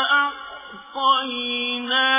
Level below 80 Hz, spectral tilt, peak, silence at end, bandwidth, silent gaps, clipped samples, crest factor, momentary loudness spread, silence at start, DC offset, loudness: -66 dBFS; -4.5 dB/octave; -6 dBFS; 0 s; 3.8 kHz; none; under 0.1%; 16 dB; 17 LU; 0 s; under 0.1%; -21 LUFS